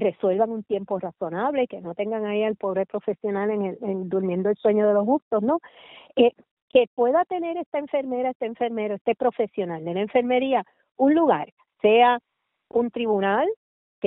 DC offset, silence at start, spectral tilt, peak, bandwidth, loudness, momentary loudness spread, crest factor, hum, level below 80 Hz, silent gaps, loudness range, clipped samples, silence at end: under 0.1%; 0 s; -4.5 dB/octave; -6 dBFS; 4 kHz; -24 LUFS; 9 LU; 18 dB; none; -68 dBFS; 5.22-5.31 s, 6.51-6.68 s, 6.87-6.97 s, 7.66-7.72 s, 8.35-8.40 s, 9.01-9.05 s, 11.52-11.57 s, 13.56-14.02 s; 4 LU; under 0.1%; 0 s